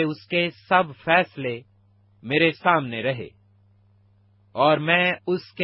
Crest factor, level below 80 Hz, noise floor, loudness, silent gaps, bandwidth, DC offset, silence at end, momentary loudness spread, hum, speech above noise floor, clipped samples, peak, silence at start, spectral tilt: 22 dB; -66 dBFS; -59 dBFS; -22 LUFS; none; 5.8 kHz; under 0.1%; 0 s; 14 LU; none; 36 dB; under 0.1%; -2 dBFS; 0 s; -9 dB/octave